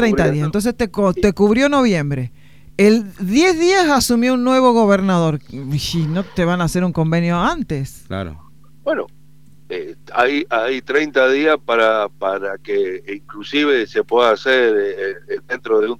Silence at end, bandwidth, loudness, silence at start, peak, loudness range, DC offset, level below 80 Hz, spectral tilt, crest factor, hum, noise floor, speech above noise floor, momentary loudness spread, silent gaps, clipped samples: 0.05 s; 16 kHz; -17 LUFS; 0 s; 0 dBFS; 7 LU; 0.8%; -42 dBFS; -5.5 dB/octave; 16 dB; none; -49 dBFS; 32 dB; 14 LU; none; under 0.1%